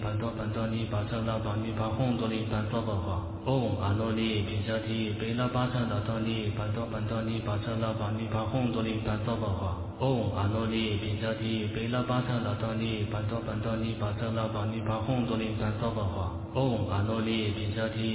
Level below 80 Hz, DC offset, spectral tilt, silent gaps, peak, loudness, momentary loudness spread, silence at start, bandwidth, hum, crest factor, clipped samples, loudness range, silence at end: -44 dBFS; under 0.1%; -6 dB/octave; none; -14 dBFS; -31 LUFS; 3 LU; 0 s; 4 kHz; none; 16 dB; under 0.1%; 1 LU; 0 s